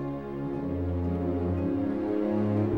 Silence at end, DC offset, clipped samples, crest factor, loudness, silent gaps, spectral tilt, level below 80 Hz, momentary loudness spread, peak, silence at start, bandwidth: 0 s; 0.2%; under 0.1%; 14 dB; -30 LUFS; none; -10.5 dB/octave; -48 dBFS; 6 LU; -16 dBFS; 0 s; 5.4 kHz